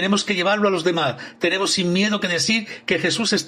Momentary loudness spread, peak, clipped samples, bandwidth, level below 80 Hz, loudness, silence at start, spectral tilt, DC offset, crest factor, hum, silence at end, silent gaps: 4 LU; -6 dBFS; under 0.1%; 15 kHz; -62 dBFS; -20 LUFS; 0 s; -3.5 dB/octave; under 0.1%; 16 dB; none; 0 s; none